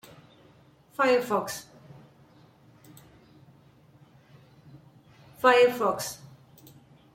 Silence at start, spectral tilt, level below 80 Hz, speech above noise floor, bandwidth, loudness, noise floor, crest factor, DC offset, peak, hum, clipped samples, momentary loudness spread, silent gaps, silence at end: 1 s; -3.5 dB/octave; -70 dBFS; 34 dB; 16.5 kHz; -25 LUFS; -58 dBFS; 24 dB; under 0.1%; -6 dBFS; none; under 0.1%; 22 LU; none; 0.9 s